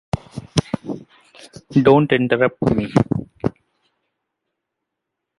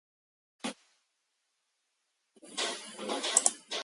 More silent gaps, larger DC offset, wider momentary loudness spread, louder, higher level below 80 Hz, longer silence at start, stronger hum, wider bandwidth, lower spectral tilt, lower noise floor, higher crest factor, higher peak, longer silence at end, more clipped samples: neither; neither; about the same, 15 LU vs 16 LU; first, -19 LUFS vs -31 LUFS; first, -46 dBFS vs -88 dBFS; second, 0.15 s vs 0.65 s; neither; about the same, 11.5 kHz vs 12 kHz; first, -7 dB/octave vs 0.5 dB/octave; about the same, -80 dBFS vs -80 dBFS; second, 20 dB vs 32 dB; first, 0 dBFS vs -4 dBFS; first, 1.9 s vs 0 s; neither